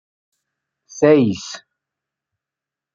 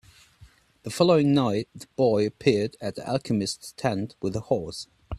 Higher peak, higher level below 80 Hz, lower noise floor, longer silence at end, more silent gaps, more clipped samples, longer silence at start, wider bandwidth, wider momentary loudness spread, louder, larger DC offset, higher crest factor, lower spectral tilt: first, 0 dBFS vs -6 dBFS; second, -62 dBFS vs -54 dBFS; first, -87 dBFS vs -55 dBFS; first, 1.35 s vs 0 s; neither; neither; about the same, 0.95 s vs 0.85 s; second, 7.6 kHz vs 14 kHz; first, 22 LU vs 16 LU; first, -15 LUFS vs -25 LUFS; neither; about the same, 22 dB vs 20 dB; about the same, -6 dB/octave vs -6 dB/octave